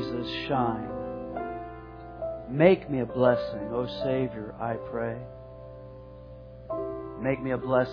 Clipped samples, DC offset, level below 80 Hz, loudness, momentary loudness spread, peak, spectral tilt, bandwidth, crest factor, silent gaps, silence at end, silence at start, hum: under 0.1%; under 0.1%; -52 dBFS; -29 LUFS; 21 LU; -4 dBFS; -9 dB/octave; 5.4 kHz; 24 dB; none; 0 s; 0 s; 60 Hz at -50 dBFS